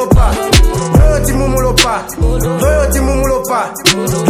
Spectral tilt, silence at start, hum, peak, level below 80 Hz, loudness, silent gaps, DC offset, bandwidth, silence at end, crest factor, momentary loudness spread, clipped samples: -4.5 dB/octave; 0 s; none; 0 dBFS; -14 dBFS; -12 LUFS; none; under 0.1%; 16.5 kHz; 0 s; 10 dB; 4 LU; 0.8%